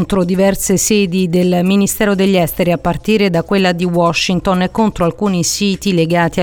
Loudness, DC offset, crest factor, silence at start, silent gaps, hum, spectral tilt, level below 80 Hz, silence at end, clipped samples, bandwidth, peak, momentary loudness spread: -14 LUFS; under 0.1%; 12 dB; 0 s; none; none; -5 dB/octave; -36 dBFS; 0 s; under 0.1%; 19 kHz; -2 dBFS; 3 LU